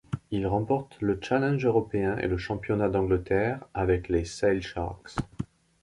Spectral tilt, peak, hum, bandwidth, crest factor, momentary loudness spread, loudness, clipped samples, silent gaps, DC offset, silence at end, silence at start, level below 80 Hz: -7 dB/octave; -10 dBFS; none; 11.5 kHz; 16 dB; 9 LU; -28 LUFS; under 0.1%; none; under 0.1%; 0.35 s; 0.1 s; -44 dBFS